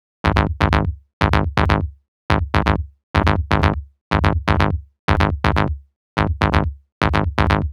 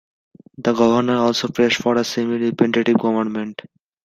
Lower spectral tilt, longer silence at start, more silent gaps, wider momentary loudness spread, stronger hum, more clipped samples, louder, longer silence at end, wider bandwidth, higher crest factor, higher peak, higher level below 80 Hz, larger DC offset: first, -7 dB/octave vs -5 dB/octave; second, 0.25 s vs 0.6 s; first, 1.13-1.21 s, 2.08-2.29 s, 3.03-3.14 s, 4.01-4.11 s, 4.99-5.08 s, 5.96-6.17 s, 6.92-7.01 s vs none; about the same, 7 LU vs 8 LU; neither; neither; about the same, -19 LUFS vs -18 LUFS; second, 0 s vs 0.5 s; second, 11.5 kHz vs 13 kHz; about the same, 18 dB vs 16 dB; about the same, 0 dBFS vs -2 dBFS; first, -26 dBFS vs -60 dBFS; neither